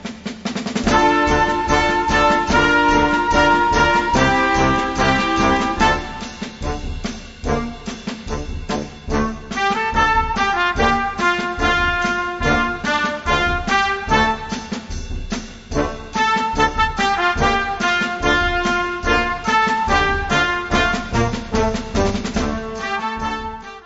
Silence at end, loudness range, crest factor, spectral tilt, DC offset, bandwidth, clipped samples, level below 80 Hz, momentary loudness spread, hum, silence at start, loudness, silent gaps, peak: 0 s; 6 LU; 18 dB; -4.5 dB/octave; under 0.1%; 8 kHz; under 0.1%; -30 dBFS; 13 LU; none; 0 s; -18 LUFS; none; -2 dBFS